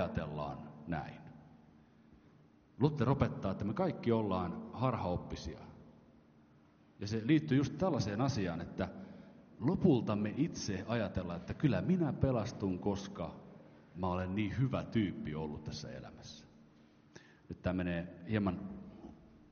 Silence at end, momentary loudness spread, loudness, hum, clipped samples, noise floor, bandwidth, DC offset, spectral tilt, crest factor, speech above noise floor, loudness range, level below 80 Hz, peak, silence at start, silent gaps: 0.15 s; 20 LU; -36 LUFS; none; under 0.1%; -65 dBFS; 6.8 kHz; under 0.1%; -7 dB/octave; 22 dB; 29 dB; 7 LU; -58 dBFS; -14 dBFS; 0 s; none